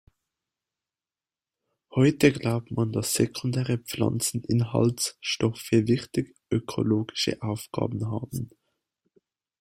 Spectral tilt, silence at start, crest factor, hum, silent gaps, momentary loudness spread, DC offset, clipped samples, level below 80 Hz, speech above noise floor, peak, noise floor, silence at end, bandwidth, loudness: -5.5 dB/octave; 1.9 s; 22 dB; none; none; 9 LU; under 0.1%; under 0.1%; -58 dBFS; over 64 dB; -4 dBFS; under -90 dBFS; 1.15 s; 16 kHz; -26 LUFS